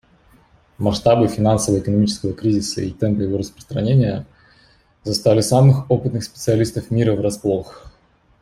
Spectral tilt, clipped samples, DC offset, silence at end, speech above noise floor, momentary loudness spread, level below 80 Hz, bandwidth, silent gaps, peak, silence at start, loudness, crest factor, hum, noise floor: -6.5 dB/octave; under 0.1%; under 0.1%; 0.5 s; 39 dB; 10 LU; -46 dBFS; 15 kHz; none; -2 dBFS; 0.8 s; -18 LUFS; 16 dB; none; -56 dBFS